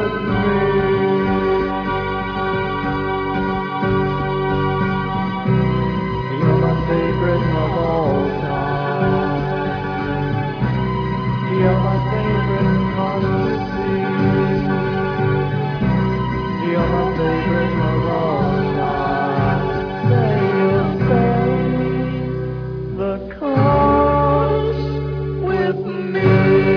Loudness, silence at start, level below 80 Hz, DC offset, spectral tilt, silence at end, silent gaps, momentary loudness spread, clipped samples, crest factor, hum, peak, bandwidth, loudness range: -18 LUFS; 0 s; -34 dBFS; under 0.1%; -9.5 dB/octave; 0 s; none; 6 LU; under 0.1%; 14 dB; none; -4 dBFS; 5.4 kHz; 2 LU